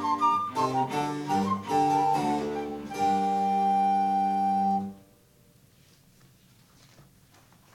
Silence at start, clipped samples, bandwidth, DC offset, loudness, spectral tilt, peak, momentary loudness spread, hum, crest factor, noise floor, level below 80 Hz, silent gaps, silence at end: 0 s; under 0.1%; 16 kHz; under 0.1%; -26 LUFS; -6 dB/octave; -14 dBFS; 7 LU; none; 14 dB; -60 dBFS; -64 dBFS; none; 2.75 s